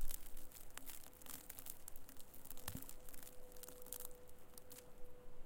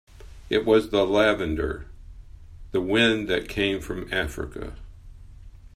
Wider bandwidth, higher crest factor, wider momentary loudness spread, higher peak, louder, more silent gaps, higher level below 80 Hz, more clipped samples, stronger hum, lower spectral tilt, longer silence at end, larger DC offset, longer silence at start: first, 17 kHz vs 15 kHz; about the same, 24 dB vs 20 dB; second, 10 LU vs 14 LU; second, -22 dBFS vs -6 dBFS; second, -55 LUFS vs -24 LUFS; neither; second, -54 dBFS vs -42 dBFS; neither; neither; second, -2.5 dB/octave vs -5.5 dB/octave; about the same, 0 s vs 0.1 s; neither; second, 0 s vs 0.15 s